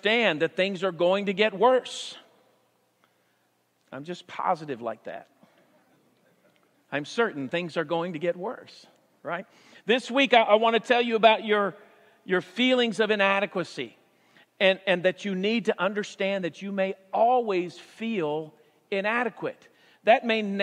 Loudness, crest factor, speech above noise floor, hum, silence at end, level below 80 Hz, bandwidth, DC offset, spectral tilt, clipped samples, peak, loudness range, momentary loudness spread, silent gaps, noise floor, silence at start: -25 LUFS; 24 dB; 44 dB; none; 0 s; -88 dBFS; 11 kHz; under 0.1%; -5 dB/octave; under 0.1%; -4 dBFS; 13 LU; 16 LU; none; -70 dBFS; 0.05 s